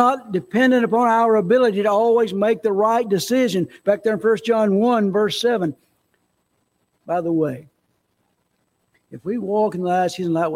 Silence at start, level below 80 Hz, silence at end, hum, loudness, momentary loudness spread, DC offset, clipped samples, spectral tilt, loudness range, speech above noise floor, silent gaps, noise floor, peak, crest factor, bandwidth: 0 s; -66 dBFS; 0 s; none; -19 LUFS; 8 LU; under 0.1%; under 0.1%; -5.5 dB/octave; 11 LU; 50 dB; none; -69 dBFS; -2 dBFS; 18 dB; 16.5 kHz